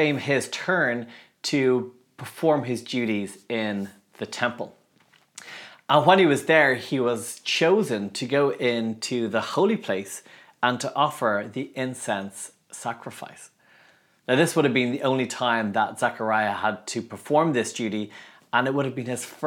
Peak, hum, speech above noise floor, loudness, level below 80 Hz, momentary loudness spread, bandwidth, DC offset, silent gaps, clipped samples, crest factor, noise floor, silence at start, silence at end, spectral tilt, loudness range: -2 dBFS; none; 37 dB; -24 LUFS; -80 dBFS; 18 LU; 17.5 kHz; under 0.1%; none; under 0.1%; 22 dB; -61 dBFS; 0 s; 0 s; -4.5 dB/octave; 7 LU